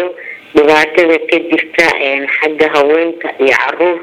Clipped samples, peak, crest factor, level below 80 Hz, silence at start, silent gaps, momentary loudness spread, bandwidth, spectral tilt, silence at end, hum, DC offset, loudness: 0.2%; 0 dBFS; 12 dB; -50 dBFS; 0 s; none; 6 LU; 15 kHz; -3.5 dB/octave; 0 s; none; under 0.1%; -11 LUFS